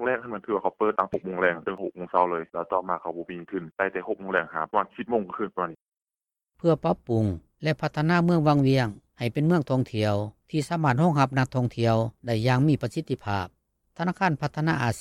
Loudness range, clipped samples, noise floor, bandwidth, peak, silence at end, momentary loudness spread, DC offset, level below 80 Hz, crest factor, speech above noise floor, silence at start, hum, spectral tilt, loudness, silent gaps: 5 LU; under 0.1%; under -90 dBFS; 13 kHz; -6 dBFS; 0 s; 10 LU; under 0.1%; -58 dBFS; 20 dB; over 65 dB; 0 s; none; -7.5 dB/octave; -26 LUFS; 5.88-5.92 s